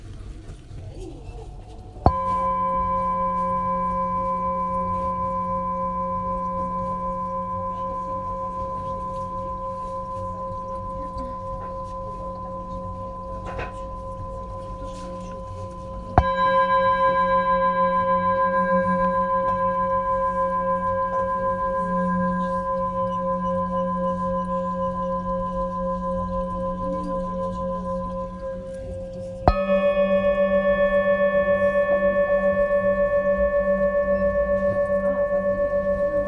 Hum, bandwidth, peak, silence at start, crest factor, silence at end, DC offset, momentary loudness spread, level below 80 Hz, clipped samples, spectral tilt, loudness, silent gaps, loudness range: none; 9.6 kHz; 0 dBFS; 0 s; 24 dB; 0 s; under 0.1%; 14 LU; -38 dBFS; under 0.1%; -8 dB/octave; -24 LUFS; none; 11 LU